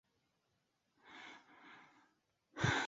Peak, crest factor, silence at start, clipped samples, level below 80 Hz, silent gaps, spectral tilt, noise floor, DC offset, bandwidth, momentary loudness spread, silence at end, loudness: -22 dBFS; 24 dB; 1.05 s; under 0.1%; -66 dBFS; none; -3 dB/octave; -83 dBFS; under 0.1%; 7.6 kHz; 23 LU; 0 s; -44 LUFS